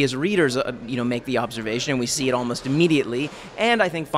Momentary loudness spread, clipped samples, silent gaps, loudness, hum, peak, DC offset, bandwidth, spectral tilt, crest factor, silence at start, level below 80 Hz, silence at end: 7 LU; under 0.1%; none; -22 LUFS; none; -6 dBFS; under 0.1%; 15.5 kHz; -4.5 dB/octave; 16 dB; 0 s; -54 dBFS; 0 s